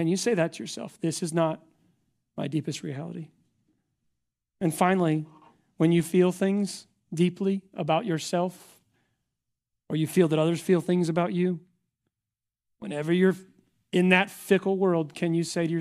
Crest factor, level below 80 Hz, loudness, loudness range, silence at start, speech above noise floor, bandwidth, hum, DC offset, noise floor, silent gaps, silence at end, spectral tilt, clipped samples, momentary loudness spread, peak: 22 dB; -72 dBFS; -26 LUFS; 7 LU; 0 s; 63 dB; 14.5 kHz; none; under 0.1%; -89 dBFS; none; 0 s; -6 dB/octave; under 0.1%; 14 LU; -4 dBFS